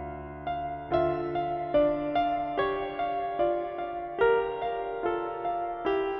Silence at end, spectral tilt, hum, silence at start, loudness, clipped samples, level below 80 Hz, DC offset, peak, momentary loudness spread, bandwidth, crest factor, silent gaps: 0 s; -4.5 dB/octave; none; 0 s; -29 LUFS; under 0.1%; -52 dBFS; under 0.1%; -12 dBFS; 9 LU; 5.8 kHz; 16 dB; none